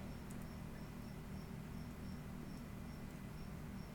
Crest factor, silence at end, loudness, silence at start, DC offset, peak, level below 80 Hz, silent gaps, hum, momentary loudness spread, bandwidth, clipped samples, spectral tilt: 12 dB; 0 s; -51 LUFS; 0 s; under 0.1%; -36 dBFS; -56 dBFS; none; 60 Hz at -60 dBFS; 1 LU; 19 kHz; under 0.1%; -6.5 dB/octave